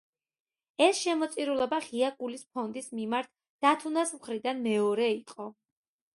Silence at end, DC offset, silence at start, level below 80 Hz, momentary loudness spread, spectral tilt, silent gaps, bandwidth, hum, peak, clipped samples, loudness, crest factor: 0.6 s; under 0.1%; 0.8 s; -78 dBFS; 13 LU; -3.5 dB/octave; 3.50-3.59 s; 11.5 kHz; none; -8 dBFS; under 0.1%; -30 LUFS; 22 dB